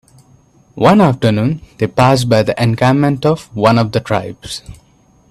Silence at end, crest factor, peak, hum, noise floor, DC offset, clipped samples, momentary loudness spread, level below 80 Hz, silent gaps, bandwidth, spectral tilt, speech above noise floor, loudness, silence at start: 0.6 s; 14 dB; 0 dBFS; none; -50 dBFS; under 0.1%; under 0.1%; 9 LU; -44 dBFS; none; 13.5 kHz; -6.5 dB/octave; 37 dB; -13 LUFS; 0.75 s